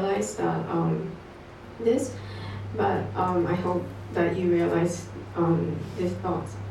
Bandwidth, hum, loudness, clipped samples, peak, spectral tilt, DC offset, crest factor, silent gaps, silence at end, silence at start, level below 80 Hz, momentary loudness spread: 12.5 kHz; none; -27 LUFS; under 0.1%; -12 dBFS; -7 dB/octave; under 0.1%; 16 dB; none; 0 s; 0 s; -52 dBFS; 12 LU